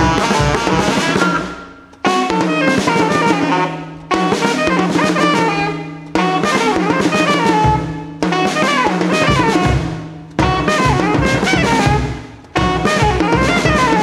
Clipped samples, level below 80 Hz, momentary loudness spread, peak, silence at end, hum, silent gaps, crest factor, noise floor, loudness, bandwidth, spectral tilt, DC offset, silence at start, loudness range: under 0.1%; -30 dBFS; 8 LU; 0 dBFS; 0 s; none; none; 14 dB; -35 dBFS; -15 LUFS; 15 kHz; -5 dB/octave; under 0.1%; 0 s; 1 LU